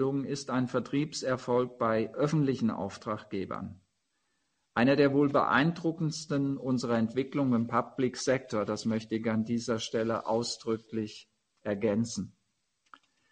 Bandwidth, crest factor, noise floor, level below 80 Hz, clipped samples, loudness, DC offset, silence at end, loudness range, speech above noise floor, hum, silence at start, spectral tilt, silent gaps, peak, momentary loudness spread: 9.6 kHz; 20 dB; -79 dBFS; -68 dBFS; under 0.1%; -30 LUFS; under 0.1%; 1.05 s; 5 LU; 49 dB; none; 0 s; -6 dB/octave; none; -10 dBFS; 11 LU